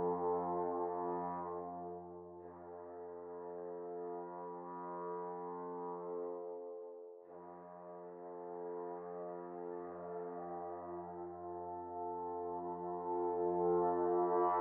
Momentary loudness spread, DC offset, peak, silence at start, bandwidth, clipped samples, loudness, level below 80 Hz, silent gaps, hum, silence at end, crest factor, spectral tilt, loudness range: 17 LU; under 0.1%; -24 dBFS; 0 s; 2.5 kHz; under 0.1%; -42 LUFS; -80 dBFS; none; none; 0 s; 18 dB; -4.5 dB/octave; 9 LU